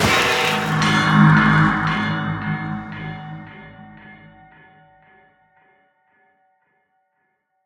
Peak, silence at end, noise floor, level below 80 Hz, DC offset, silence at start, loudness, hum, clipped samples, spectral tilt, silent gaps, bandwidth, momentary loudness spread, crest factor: 0 dBFS; 3.5 s; -70 dBFS; -46 dBFS; under 0.1%; 0 s; -17 LUFS; none; under 0.1%; -5 dB/octave; none; 18.5 kHz; 23 LU; 20 dB